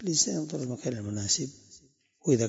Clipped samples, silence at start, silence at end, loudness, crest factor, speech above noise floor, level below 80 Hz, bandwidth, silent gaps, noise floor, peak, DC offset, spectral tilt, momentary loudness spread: under 0.1%; 0 s; 0 s; -30 LUFS; 20 dB; 30 dB; -68 dBFS; 8 kHz; none; -60 dBFS; -10 dBFS; under 0.1%; -4 dB/octave; 9 LU